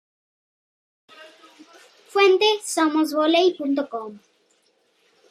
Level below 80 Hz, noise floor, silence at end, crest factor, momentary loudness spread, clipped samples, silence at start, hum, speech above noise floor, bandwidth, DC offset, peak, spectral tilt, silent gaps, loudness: -86 dBFS; -65 dBFS; 1.15 s; 18 dB; 14 LU; under 0.1%; 1.2 s; none; 45 dB; 15 kHz; under 0.1%; -6 dBFS; -2 dB/octave; none; -20 LUFS